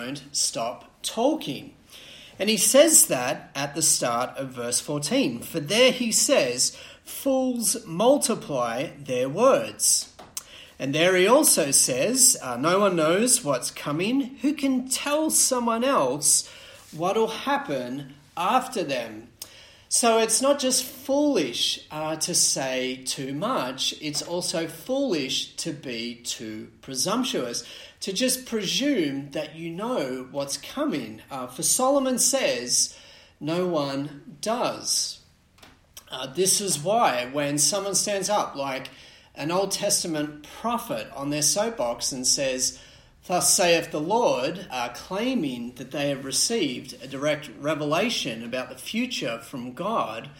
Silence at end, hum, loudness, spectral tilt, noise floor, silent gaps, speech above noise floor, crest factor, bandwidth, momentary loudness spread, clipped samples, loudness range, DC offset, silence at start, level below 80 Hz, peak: 0 s; none; -23 LUFS; -2.5 dB/octave; -54 dBFS; none; 30 dB; 22 dB; 16.5 kHz; 14 LU; under 0.1%; 7 LU; under 0.1%; 0 s; -62 dBFS; -4 dBFS